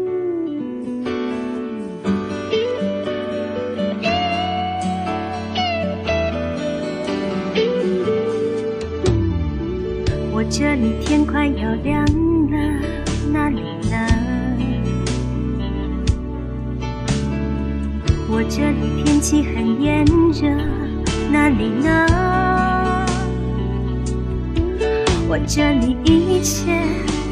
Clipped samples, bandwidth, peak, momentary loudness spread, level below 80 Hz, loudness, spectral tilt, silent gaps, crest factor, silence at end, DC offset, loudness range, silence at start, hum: under 0.1%; 15.5 kHz; 0 dBFS; 8 LU; -28 dBFS; -20 LUFS; -6 dB/octave; none; 18 dB; 0 s; under 0.1%; 5 LU; 0 s; none